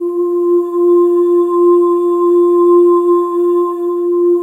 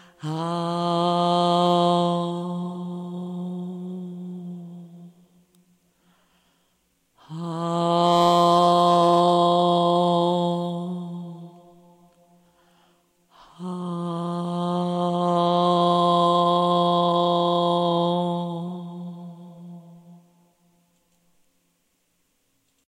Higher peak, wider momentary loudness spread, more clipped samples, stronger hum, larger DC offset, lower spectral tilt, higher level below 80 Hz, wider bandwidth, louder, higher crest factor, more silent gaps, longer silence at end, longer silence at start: first, -2 dBFS vs -8 dBFS; second, 6 LU vs 19 LU; neither; neither; neither; about the same, -7 dB/octave vs -7 dB/octave; second, -84 dBFS vs -74 dBFS; second, 1.8 kHz vs 10.5 kHz; first, -11 LUFS vs -22 LUFS; second, 8 dB vs 16 dB; neither; second, 0 s vs 2.75 s; second, 0 s vs 0.2 s